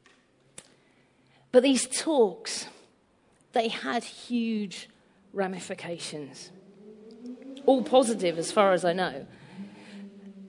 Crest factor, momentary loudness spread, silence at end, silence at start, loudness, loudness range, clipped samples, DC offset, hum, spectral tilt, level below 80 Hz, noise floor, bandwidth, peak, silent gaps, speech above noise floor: 22 dB; 23 LU; 0 s; 1.55 s; -27 LUFS; 8 LU; under 0.1%; under 0.1%; none; -4 dB/octave; -76 dBFS; -64 dBFS; 11 kHz; -8 dBFS; none; 38 dB